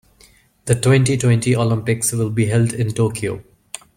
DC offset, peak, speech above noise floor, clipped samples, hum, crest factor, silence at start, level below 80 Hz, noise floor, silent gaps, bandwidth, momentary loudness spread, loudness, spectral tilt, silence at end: under 0.1%; 0 dBFS; 35 dB; under 0.1%; none; 18 dB; 0.65 s; -48 dBFS; -52 dBFS; none; 16 kHz; 17 LU; -18 LUFS; -5.5 dB/octave; 0.55 s